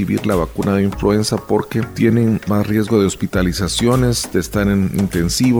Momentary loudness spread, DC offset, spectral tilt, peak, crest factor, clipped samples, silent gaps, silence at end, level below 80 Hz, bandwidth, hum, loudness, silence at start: 4 LU; under 0.1%; -5.5 dB/octave; -2 dBFS; 14 dB; under 0.1%; none; 0 s; -32 dBFS; over 20 kHz; none; -17 LUFS; 0 s